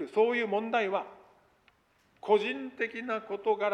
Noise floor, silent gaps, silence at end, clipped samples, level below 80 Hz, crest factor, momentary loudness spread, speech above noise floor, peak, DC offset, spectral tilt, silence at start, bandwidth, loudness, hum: -68 dBFS; none; 0 s; under 0.1%; -78 dBFS; 18 dB; 8 LU; 38 dB; -12 dBFS; under 0.1%; -5.5 dB/octave; 0 s; 8.6 kHz; -30 LUFS; none